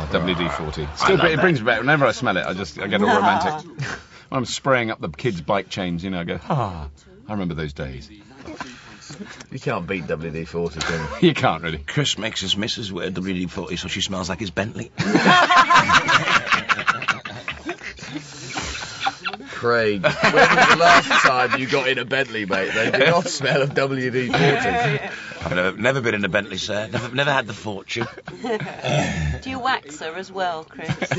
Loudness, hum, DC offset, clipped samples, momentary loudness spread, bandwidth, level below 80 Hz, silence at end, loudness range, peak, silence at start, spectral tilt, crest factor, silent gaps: -20 LUFS; none; under 0.1%; under 0.1%; 16 LU; 8 kHz; -44 dBFS; 0 s; 11 LU; -2 dBFS; 0 s; -4.5 dB/octave; 20 dB; none